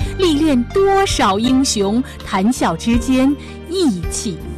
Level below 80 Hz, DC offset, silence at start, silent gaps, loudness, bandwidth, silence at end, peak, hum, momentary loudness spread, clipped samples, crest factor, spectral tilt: -30 dBFS; under 0.1%; 0 s; none; -16 LUFS; 14 kHz; 0 s; -4 dBFS; none; 8 LU; under 0.1%; 12 dB; -4.5 dB/octave